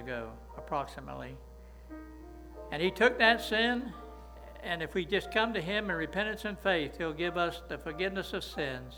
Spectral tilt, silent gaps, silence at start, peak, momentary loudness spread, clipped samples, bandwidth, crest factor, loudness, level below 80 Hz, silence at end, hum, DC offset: -5 dB/octave; none; 0 s; -10 dBFS; 21 LU; under 0.1%; over 20 kHz; 24 dB; -31 LUFS; -52 dBFS; 0 s; none; under 0.1%